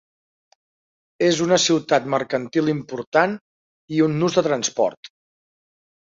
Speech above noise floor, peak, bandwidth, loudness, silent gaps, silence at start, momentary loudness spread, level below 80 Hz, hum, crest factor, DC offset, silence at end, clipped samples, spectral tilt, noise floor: over 70 dB; -4 dBFS; 7.8 kHz; -20 LUFS; 3.07-3.12 s, 3.41-3.88 s, 4.97-5.03 s; 1.2 s; 7 LU; -64 dBFS; none; 20 dB; under 0.1%; 0.95 s; under 0.1%; -4 dB/octave; under -90 dBFS